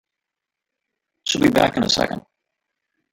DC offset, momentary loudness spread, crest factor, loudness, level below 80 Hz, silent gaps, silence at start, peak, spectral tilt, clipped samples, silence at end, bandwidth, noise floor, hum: under 0.1%; 12 LU; 20 dB; -19 LUFS; -50 dBFS; none; 1.25 s; -2 dBFS; -4 dB/octave; under 0.1%; 0.95 s; 17 kHz; -85 dBFS; none